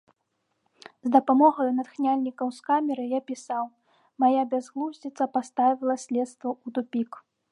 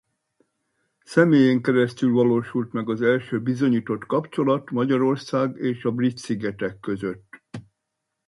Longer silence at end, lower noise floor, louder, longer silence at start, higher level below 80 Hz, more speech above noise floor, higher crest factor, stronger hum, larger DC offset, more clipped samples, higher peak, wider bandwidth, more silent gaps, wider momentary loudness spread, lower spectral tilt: second, 0.35 s vs 0.65 s; about the same, -77 dBFS vs -80 dBFS; second, -26 LUFS vs -22 LUFS; about the same, 1.05 s vs 1.1 s; second, -86 dBFS vs -64 dBFS; second, 51 dB vs 59 dB; about the same, 20 dB vs 18 dB; neither; neither; neither; about the same, -6 dBFS vs -4 dBFS; about the same, 11 kHz vs 11.5 kHz; neither; about the same, 12 LU vs 12 LU; second, -5 dB/octave vs -7.5 dB/octave